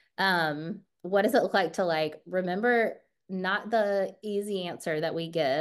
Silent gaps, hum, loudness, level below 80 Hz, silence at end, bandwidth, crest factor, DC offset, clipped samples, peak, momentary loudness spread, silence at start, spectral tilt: none; none; -28 LUFS; -80 dBFS; 0 s; 12.5 kHz; 18 dB; under 0.1%; under 0.1%; -12 dBFS; 9 LU; 0.2 s; -5 dB/octave